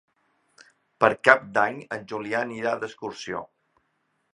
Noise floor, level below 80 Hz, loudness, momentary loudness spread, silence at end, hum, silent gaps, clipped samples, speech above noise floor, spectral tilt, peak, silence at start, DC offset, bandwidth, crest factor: -73 dBFS; -68 dBFS; -24 LUFS; 16 LU; 0.9 s; none; none; under 0.1%; 48 dB; -4.5 dB/octave; 0 dBFS; 1 s; under 0.1%; 11.5 kHz; 26 dB